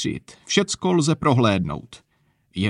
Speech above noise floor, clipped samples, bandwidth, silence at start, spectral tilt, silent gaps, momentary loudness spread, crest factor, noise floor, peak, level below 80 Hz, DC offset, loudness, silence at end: 43 dB; under 0.1%; 11 kHz; 0 s; -5 dB/octave; none; 16 LU; 18 dB; -64 dBFS; -4 dBFS; -50 dBFS; under 0.1%; -21 LUFS; 0 s